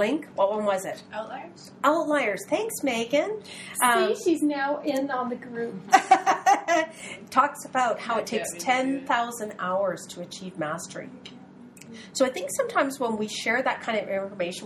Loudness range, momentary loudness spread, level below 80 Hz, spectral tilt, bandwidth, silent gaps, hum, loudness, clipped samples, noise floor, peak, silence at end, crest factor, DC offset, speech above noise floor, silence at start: 7 LU; 15 LU; -72 dBFS; -3 dB/octave; 14 kHz; none; none; -26 LUFS; under 0.1%; -47 dBFS; -2 dBFS; 0 s; 24 dB; under 0.1%; 21 dB; 0 s